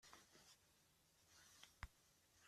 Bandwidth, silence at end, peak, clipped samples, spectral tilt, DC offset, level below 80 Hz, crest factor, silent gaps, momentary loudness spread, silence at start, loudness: 14.5 kHz; 0 s; -36 dBFS; under 0.1%; -2.5 dB/octave; under 0.1%; -72 dBFS; 32 dB; none; 8 LU; 0 s; -65 LUFS